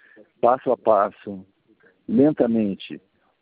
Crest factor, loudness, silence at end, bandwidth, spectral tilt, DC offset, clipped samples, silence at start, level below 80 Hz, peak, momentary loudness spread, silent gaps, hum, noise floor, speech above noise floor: 20 dB; -21 LUFS; 0.45 s; 4.9 kHz; -12 dB/octave; under 0.1%; under 0.1%; 0.45 s; -64 dBFS; -4 dBFS; 20 LU; none; none; -59 dBFS; 38 dB